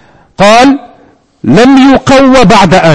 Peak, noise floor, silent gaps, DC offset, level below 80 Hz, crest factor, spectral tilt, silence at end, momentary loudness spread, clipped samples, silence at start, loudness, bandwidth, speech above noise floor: 0 dBFS; -42 dBFS; none; under 0.1%; -28 dBFS; 4 dB; -5.5 dB/octave; 0 s; 6 LU; 10%; 0 s; -4 LUFS; 11 kHz; 39 dB